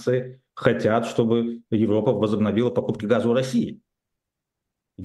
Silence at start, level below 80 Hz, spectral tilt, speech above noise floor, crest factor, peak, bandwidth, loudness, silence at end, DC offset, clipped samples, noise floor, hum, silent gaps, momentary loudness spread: 0 s; -62 dBFS; -7 dB/octave; 62 dB; 22 dB; 0 dBFS; 12 kHz; -23 LUFS; 0 s; under 0.1%; under 0.1%; -84 dBFS; none; none; 5 LU